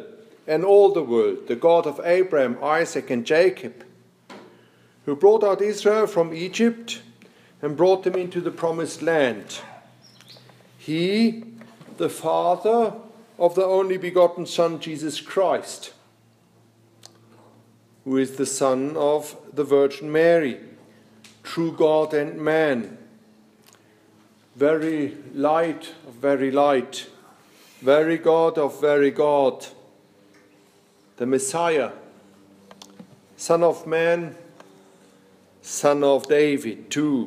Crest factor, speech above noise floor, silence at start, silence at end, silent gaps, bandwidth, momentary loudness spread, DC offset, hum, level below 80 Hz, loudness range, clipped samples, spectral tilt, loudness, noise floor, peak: 18 dB; 37 dB; 0 s; 0 s; none; 15.5 kHz; 16 LU; under 0.1%; none; -78 dBFS; 5 LU; under 0.1%; -5 dB/octave; -21 LUFS; -58 dBFS; -4 dBFS